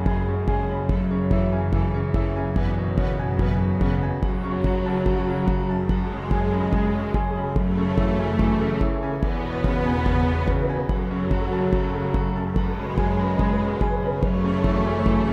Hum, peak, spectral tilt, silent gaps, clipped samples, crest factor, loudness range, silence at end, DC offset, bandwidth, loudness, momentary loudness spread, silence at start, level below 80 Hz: none; -6 dBFS; -9.5 dB/octave; none; under 0.1%; 16 dB; 1 LU; 0 s; under 0.1%; 5.8 kHz; -23 LUFS; 3 LU; 0 s; -26 dBFS